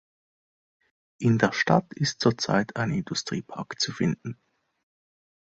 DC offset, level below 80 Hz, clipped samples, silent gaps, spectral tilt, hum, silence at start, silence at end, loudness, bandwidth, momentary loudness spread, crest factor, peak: under 0.1%; -60 dBFS; under 0.1%; none; -5 dB/octave; none; 1.2 s; 1.25 s; -26 LUFS; 8.2 kHz; 11 LU; 24 dB; -4 dBFS